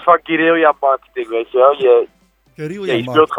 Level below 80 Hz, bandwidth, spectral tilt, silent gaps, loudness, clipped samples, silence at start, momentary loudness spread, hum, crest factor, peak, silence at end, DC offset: -60 dBFS; 7.8 kHz; -6.5 dB/octave; none; -14 LUFS; under 0.1%; 0 s; 14 LU; none; 14 dB; 0 dBFS; 0 s; under 0.1%